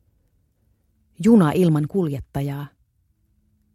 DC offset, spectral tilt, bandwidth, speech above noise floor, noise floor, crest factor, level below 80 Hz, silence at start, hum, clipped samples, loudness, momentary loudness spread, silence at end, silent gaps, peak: under 0.1%; -8 dB/octave; 14 kHz; 47 dB; -65 dBFS; 18 dB; -52 dBFS; 1.2 s; none; under 0.1%; -20 LUFS; 15 LU; 1.1 s; none; -4 dBFS